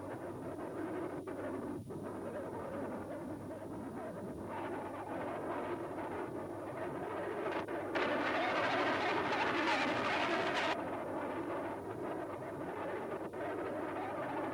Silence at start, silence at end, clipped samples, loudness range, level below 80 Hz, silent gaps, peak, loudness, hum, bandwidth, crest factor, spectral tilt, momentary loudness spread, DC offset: 0 s; 0 s; under 0.1%; 9 LU; -68 dBFS; none; -20 dBFS; -39 LUFS; none; 18.5 kHz; 18 dB; -5 dB/octave; 11 LU; under 0.1%